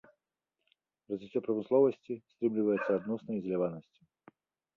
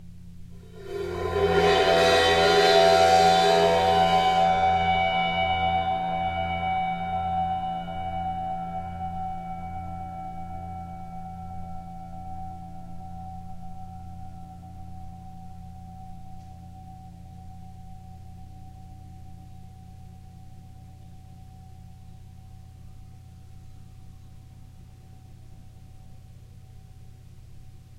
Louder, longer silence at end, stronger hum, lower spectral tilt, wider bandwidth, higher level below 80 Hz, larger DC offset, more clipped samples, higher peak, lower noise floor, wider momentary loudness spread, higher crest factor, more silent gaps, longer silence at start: second, -32 LUFS vs -23 LUFS; first, 0.95 s vs 0 s; neither; first, -9.5 dB/octave vs -4.5 dB/octave; second, 4.4 kHz vs 15 kHz; second, -76 dBFS vs -48 dBFS; neither; neither; second, -16 dBFS vs -8 dBFS; first, -88 dBFS vs -46 dBFS; second, 14 LU vs 27 LU; about the same, 18 dB vs 20 dB; neither; first, 1.1 s vs 0 s